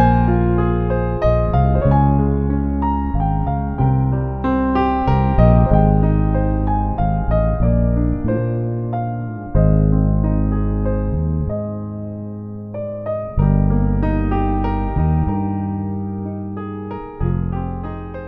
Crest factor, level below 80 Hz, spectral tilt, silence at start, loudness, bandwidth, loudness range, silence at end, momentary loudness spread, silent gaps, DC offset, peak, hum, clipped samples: 16 dB; -22 dBFS; -11.5 dB/octave; 0 s; -19 LUFS; 4.3 kHz; 5 LU; 0 s; 12 LU; none; under 0.1%; 0 dBFS; none; under 0.1%